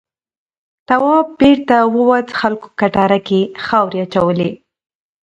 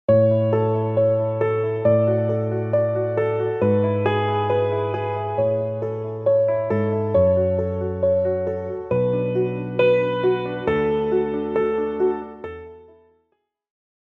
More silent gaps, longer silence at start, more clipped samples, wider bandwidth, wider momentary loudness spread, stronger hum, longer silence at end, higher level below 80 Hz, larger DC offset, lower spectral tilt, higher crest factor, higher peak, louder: neither; first, 0.9 s vs 0.1 s; neither; first, 8 kHz vs 4.3 kHz; about the same, 7 LU vs 7 LU; neither; second, 0.7 s vs 1.25 s; about the same, -48 dBFS vs -52 dBFS; neither; second, -7.5 dB/octave vs -10 dB/octave; about the same, 14 dB vs 14 dB; first, 0 dBFS vs -6 dBFS; first, -14 LUFS vs -21 LUFS